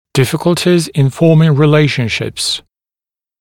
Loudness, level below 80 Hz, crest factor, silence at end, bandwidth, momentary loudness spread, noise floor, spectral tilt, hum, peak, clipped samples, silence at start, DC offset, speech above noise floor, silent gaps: -12 LUFS; -48 dBFS; 12 dB; 0.8 s; 16.5 kHz; 8 LU; under -90 dBFS; -6 dB/octave; none; 0 dBFS; under 0.1%; 0.15 s; under 0.1%; over 79 dB; none